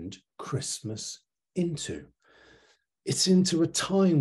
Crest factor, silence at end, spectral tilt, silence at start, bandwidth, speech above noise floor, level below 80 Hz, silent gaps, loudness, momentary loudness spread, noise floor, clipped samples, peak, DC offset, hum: 16 dB; 0 s; -4.5 dB/octave; 0 s; 12.5 kHz; 38 dB; -64 dBFS; none; -28 LUFS; 19 LU; -64 dBFS; under 0.1%; -12 dBFS; under 0.1%; none